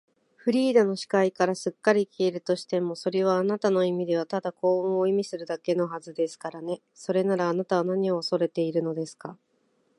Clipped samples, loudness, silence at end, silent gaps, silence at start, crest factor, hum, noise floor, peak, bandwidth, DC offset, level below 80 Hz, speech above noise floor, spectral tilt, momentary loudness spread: under 0.1%; -26 LUFS; 0.65 s; none; 0.45 s; 20 dB; none; -69 dBFS; -6 dBFS; 11.5 kHz; under 0.1%; -78 dBFS; 43 dB; -6 dB/octave; 9 LU